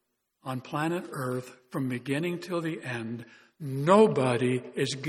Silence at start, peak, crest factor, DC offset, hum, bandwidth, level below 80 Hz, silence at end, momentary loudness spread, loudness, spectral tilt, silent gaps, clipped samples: 0.45 s; -8 dBFS; 22 dB; under 0.1%; none; 15 kHz; -72 dBFS; 0 s; 17 LU; -28 LUFS; -6 dB/octave; none; under 0.1%